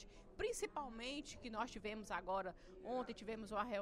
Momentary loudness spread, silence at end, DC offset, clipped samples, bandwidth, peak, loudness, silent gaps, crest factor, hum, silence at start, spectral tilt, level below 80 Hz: 6 LU; 0 s; under 0.1%; under 0.1%; 13 kHz; -28 dBFS; -46 LUFS; none; 18 dB; none; 0 s; -3.5 dB/octave; -62 dBFS